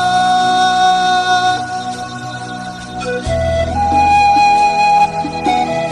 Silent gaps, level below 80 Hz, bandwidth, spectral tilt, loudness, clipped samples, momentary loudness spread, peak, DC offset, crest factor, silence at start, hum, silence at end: none; -34 dBFS; 11 kHz; -4 dB/octave; -13 LUFS; under 0.1%; 15 LU; -2 dBFS; under 0.1%; 10 dB; 0 s; none; 0 s